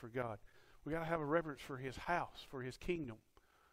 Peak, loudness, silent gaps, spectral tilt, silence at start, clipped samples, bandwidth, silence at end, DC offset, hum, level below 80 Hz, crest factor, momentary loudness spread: -22 dBFS; -43 LUFS; none; -6.5 dB/octave; 0 s; under 0.1%; 16 kHz; 0.55 s; under 0.1%; none; -62 dBFS; 20 dB; 13 LU